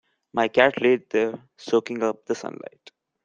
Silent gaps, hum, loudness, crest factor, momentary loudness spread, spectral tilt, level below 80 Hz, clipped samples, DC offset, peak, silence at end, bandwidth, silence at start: none; none; -23 LUFS; 22 dB; 19 LU; -5 dB/octave; -68 dBFS; under 0.1%; under 0.1%; -2 dBFS; 0.7 s; 7.6 kHz; 0.35 s